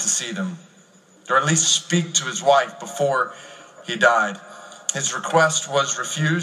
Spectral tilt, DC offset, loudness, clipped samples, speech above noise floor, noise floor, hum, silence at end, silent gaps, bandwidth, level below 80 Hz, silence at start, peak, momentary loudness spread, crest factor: -2.5 dB/octave; under 0.1%; -20 LUFS; under 0.1%; 31 dB; -52 dBFS; none; 0 s; none; 15 kHz; -74 dBFS; 0 s; -2 dBFS; 14 LU; 20 dB